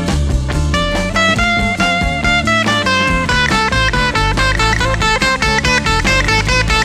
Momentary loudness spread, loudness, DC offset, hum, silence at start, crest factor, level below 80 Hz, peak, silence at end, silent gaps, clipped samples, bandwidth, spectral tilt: 3 LU; -13 LUFS; under 0.1%; none; 0 s; 14 dB; -22 dBFS; 0 dBFS; 0 s; none; under 0.1%; 15.5 kHz; -4 dB/octave